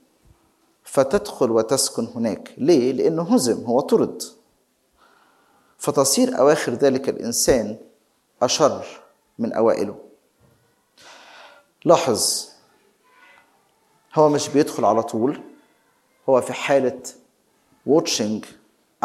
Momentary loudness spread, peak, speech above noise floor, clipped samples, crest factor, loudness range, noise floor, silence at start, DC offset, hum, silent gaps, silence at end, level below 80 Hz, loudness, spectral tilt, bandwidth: 13 LU; 0 dBFS; 45 dB; under 0.1%; 22 dB; 4 LU; -65 dBFS; 0.85 s; under 0.1%; none; none; 0.55 s; -56 dBFS; -20 LUFS; -4 dB/octave; 15.5 kHz